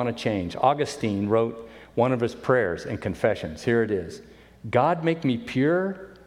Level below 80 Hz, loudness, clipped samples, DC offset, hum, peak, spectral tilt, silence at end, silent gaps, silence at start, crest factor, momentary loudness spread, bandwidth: -54 dBFS; -25 LUFS; under 0.1%; under 0.1%; none; -6 dBFS; -6.5 dB/octave; 0.1 s; none; 0 s; 18 dB; 8 LU; 13 kHz